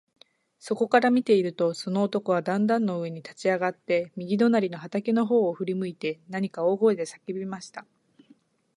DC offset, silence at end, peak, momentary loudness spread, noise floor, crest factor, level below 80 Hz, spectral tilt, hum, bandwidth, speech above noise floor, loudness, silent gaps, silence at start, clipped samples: under 0.1%; 0.95 s; -6 dBFS; 12 LU; -61 dBFS; 20 dB; -76 dBFS; -6.5 dB/octave; none; 11.5 kHz; 35 dB; -26 LUFS; none; 0.65 s; under 0.1%